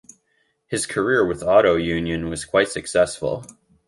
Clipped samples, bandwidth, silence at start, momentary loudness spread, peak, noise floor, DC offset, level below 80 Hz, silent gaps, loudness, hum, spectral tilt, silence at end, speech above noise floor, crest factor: under 0.1%; 11.5 kHz; 0.7 s; 11 LU; -2 dBFS; -68 dBFS; under 0.1%; -46 dBFS; none; -21 LUFS; none; -4.5 dB/octave; 0.35 s; 47 dB; 18 dB